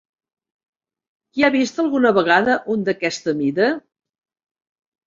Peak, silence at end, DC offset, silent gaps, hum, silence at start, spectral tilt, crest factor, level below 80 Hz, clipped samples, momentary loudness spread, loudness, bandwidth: -2 dBFS; 1.3 s; under 0.1%; none; none; 1.35 s; -5 dB/octave; 18 dB; -62 dBFS; under 0.1%; 7 LU; -18 LUFS; 7.6 kHz